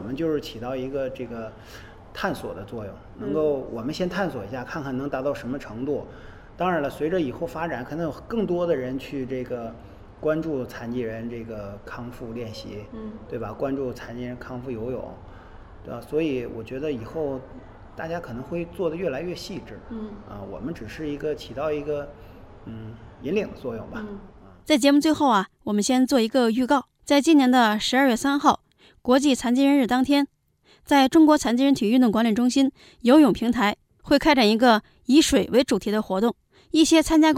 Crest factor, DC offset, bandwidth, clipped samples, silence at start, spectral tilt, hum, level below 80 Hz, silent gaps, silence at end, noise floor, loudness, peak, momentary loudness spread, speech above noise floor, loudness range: 20 dB; under 0.1%; 16 kHz; under 0.1%; 0 s; -4.5 dB/octave; none; -48 dBFS; none; 0 s; -60 dBFS; -23 LUFS; -4 dBFS; 19 LU; 37 dB; 13 LU